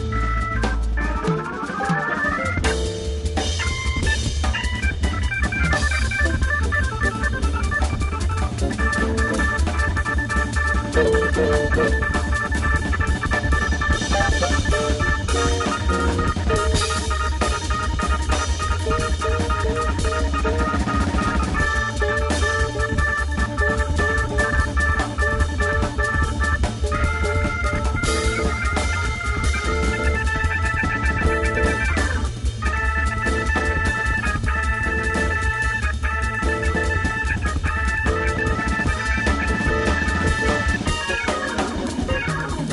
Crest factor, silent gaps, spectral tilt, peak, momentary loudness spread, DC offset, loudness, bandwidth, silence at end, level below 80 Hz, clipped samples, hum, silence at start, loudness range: 16 dB; none; -5 dB/octave; -4 dBFS; 3 LU; under 0.1%; -21 LUFS; 11.5 kHz; 0 s; -24 dBFS; under 0.1%; none; 0 s; 2 LU